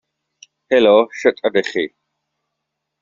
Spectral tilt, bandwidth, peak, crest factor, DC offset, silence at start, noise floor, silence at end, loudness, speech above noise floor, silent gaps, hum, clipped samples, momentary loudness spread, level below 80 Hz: -2 dB/octave; 7.6 kHz; -2 dBFS; 18 dB; under 0.1%; 0.7 s; -78 dBFS; 1.15 s; -16 LUFS; 63 dB; none; none; under 0.1%; 11 LU; -62 dBFS